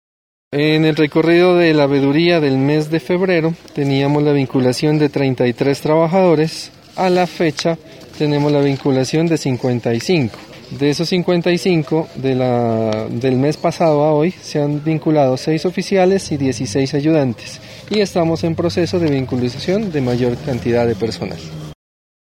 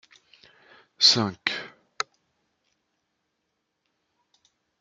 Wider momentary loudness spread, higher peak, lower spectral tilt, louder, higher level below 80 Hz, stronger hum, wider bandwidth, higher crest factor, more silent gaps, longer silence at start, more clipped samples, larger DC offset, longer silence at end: second, 8 LU vs 17 LU; about the same, -2 dBFS vs -2 dBFS; first, -6.5 dB/octave vs -2 dB/octave; first, -16 LUFS vs -23 LUFS; first, -50 dBFS vs -78 dBFS; neither; first, 15.5 kHz vs 12.5 kHz; second, 14 dB vs 28 dB; neither; second, 0.5 s vs 1 s; neither; neither; second, 0.5 s vs 3.15 s